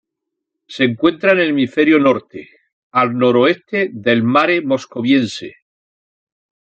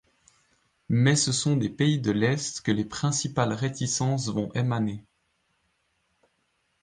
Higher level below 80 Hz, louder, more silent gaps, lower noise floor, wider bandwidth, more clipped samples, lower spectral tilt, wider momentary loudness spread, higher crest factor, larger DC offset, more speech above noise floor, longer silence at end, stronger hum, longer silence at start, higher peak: about the same, -62 dBFS vs -60 dBFS; first, -15 LUFS vs -26 LUFS; first, 2.72-2.91 s vs none; first, -79 dBFS vs -73 dBFS; second, 8.8 kHz vs 10 kHz; neither; about the same, -6 dB/octave vs -5 dB/octave; first, 12 LU vs 7 LU; about the same, 16 dB vs 18 dB; neither; first, 64 dB vs 48 dB; second, 1.25 s vs 1.85 s; neither; second, 0.7 s vs 0.9 s; first, 0 dBFS vs -8 dBFS